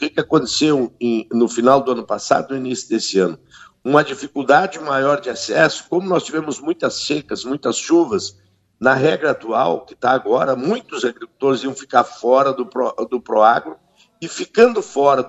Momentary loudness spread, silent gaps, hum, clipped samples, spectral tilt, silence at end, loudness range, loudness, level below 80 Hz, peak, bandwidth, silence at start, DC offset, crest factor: 9 LU; none; none; under 0.1%; -4.5 dB/octave; 0 s; 2 LU; -18 LUFS; -60 dBFS; 0 dBFS; 8.4 kHz; 0 s; under 0.1%; 18 dB